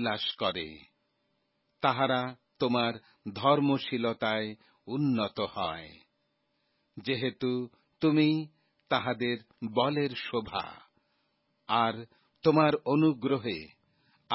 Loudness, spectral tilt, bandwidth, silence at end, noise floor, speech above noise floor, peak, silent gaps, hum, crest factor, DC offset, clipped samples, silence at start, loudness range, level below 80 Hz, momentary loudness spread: -30 LUFS; -10 dB/octave; 5.8 kHz; 0 s; -77 dBFS; 47 dB; -10 dBFS; none; none; 20 dB; under 0.1%; under 0.1%; 0 s; 4 LU; -66 dBFS; 14 LU